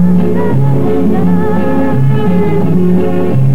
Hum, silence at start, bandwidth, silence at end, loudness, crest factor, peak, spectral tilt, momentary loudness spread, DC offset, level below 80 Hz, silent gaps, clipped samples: none; 0 s; 5.2 kHz; 0 s; -11 LUFS; 8 dB; 0 dBFS; -10 dB/octave; 2 LU; 30%; -40 dBFS; none; under 0.1%